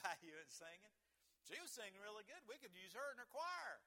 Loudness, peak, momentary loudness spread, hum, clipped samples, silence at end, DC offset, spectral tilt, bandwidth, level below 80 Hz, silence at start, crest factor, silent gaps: -54 LUFS; -30 dBFS; 10 LU; none; under 0.1%; 0.05 s; under 0.1%; -1 dB/octave; 18 kHz; under -90 dBFS; 0 s; 24 dB; none